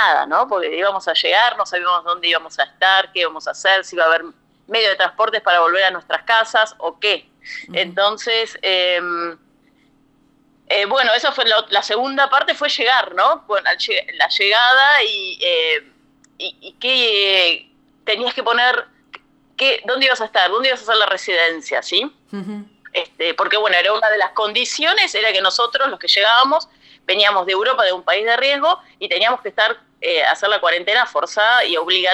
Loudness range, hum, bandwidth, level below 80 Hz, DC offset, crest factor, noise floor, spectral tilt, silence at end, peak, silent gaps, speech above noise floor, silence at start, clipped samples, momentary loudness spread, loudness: 3 LU; none; 14 kHz; -68 dBFS; under 0.1%; 18 dB; -56 dBFS; -1 dB/octave; 0 s; 0 dBFS; none; 39 dB; 0 s; under 0.1%; 9 LU; -16 LUFS